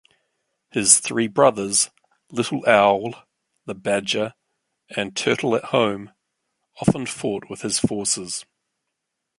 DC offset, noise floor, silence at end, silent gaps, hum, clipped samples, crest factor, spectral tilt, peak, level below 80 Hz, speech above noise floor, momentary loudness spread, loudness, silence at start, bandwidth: under 0.1%; -80 dBFS; 0.95 s; none; none; under 0.1%; 22 dB; -3 dB/octave; 0 dBFS; -58 dBFS; 59 dB; 15 LU; -21 LUFS; 0.75 s; 11.5 kHz